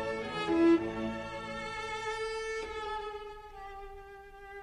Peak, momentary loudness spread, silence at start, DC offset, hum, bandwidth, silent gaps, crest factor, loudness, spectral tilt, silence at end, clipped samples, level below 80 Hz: -16 dBFS; 21 LU; 0 s; under 0.1%; none; 10.5 kHz; none; 18 dB; -33 LUFS; -5 dB/octave; 0 s; under 0.1%; -54 dBFS